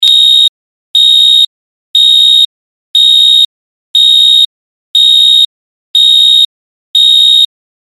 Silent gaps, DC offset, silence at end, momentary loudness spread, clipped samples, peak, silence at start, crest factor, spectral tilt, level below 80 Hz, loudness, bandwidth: 0.49-0.94 s, 1.47-1.94 s, 2.45-2.94 s, 3.45-3.94 s, 4.46-4.94 s, 5.45-5.94 s, 6.45-6.94 s; 0.7%; 0.45 s; 9 LU; under 0.1%; 0 dBFS; 0 s; 8 dB; 4.5 dB/octave; -50 dBFS; -4 LUFS; 16 kHz